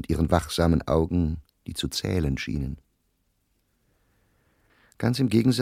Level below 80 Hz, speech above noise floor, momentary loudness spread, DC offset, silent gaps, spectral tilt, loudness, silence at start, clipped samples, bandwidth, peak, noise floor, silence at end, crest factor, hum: -38 dBFS; 47 dB; 12 LU; under 0.1%; none; -6 dB/octave; -25 LUFS; 0 s; under 0.1%; 16 kHz; -4 dBFS; -71 dBFS; 0 s; 22 dB; none